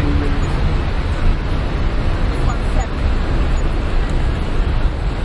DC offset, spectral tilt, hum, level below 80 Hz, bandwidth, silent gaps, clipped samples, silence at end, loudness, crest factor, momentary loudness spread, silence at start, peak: under 0.1%; -7 dB/octave; none; -18 dBFS; 11 kHz; none; under 0.1%; 0 s; -20 LUFS; 12 dB; 2 LU; 0 s; -4 dBFS